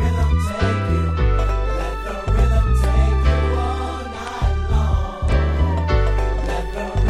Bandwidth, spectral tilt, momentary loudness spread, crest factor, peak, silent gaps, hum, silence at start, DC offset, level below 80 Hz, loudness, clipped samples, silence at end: 11.5 kHz; -7 dB/octave; 7 LU; 14 dB; -4 dBFS; none; none; 0 s; under 0.1%; -20 dBFS; -20 LUFS; under 0.1%; 0 s